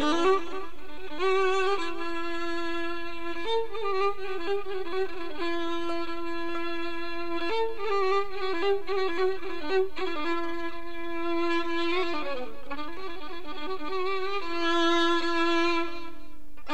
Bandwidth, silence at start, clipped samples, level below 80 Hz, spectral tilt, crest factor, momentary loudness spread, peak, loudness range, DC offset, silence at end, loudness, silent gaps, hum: 15 kHz; 0 s; under 0.1%; -52 dBFS; -4 dB/octave; 16 dB; 13 LU; -12 dBFS; 4 LU; 4%; 0 s; -30 LUFS; none; none